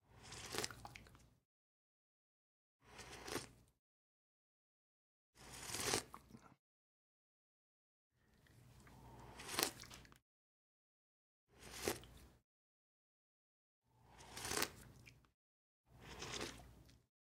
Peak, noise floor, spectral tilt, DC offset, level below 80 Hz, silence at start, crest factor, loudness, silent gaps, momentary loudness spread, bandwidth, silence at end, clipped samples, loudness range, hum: -8 dBFS; -71 dBFS; -2 dB/octave; under 0.1%; -72 dBFS; 0.1 s; 44 dB; -46 LUFS; 1.45-2.80 s, 3.79-5.33 s, 6.59-8.10 s, 10.22-11.47 s, 12.44-13.82 s, 15.34-15.84 s; 24 LU; 16 kHz; 0.3 s; under 0.1%; 8 LU; none